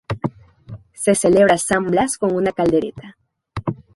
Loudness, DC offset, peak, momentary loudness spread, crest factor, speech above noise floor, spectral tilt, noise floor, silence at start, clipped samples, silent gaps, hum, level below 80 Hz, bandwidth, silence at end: -18 LUFS; under 0.1%; -2 dBFS; 15 LU; 16 dB; 22 dB; -5 dB/octave; -39 dBFS; 0.1 s; under 0.1%; none; none; -48 dBFS; 12 kHz; 0.15 s